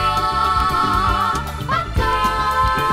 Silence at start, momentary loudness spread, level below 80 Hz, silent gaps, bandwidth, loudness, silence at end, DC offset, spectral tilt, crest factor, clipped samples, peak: 0 s; 4 LU; -28 dBFS; none; 16 kHz; -18 LUFS; 0 s; under 0.1%; -4.5 dB/octave; 12 dB; under 0.1%; -6 dBFS